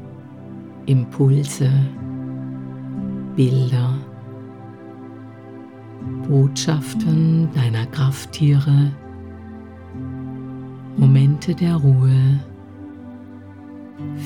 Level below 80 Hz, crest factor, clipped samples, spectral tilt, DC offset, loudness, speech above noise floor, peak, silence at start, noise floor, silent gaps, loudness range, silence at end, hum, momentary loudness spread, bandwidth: -58 dBFS; 16 dB; under 0.1%; -7.5 dB/octave; 0.1%; -18 LUFS; 21 dB; -4 dBFS; 0 s; -38 dBFS; none; 6 LU; 0 s; none; 22 LU; 11.5 kHz